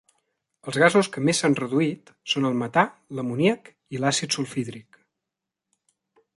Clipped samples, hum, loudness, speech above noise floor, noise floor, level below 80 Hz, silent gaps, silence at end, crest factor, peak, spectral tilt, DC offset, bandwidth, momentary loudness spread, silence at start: under 0.1%; none; -23 LUFS; 62 dB; -86 dBFS; -68 dBFS; none; 1.55 s; 22 dB; -4 dBFS; -4.5 dB/octave; under 0.1%; 11.5 kHz; 15 LU; 0.65 s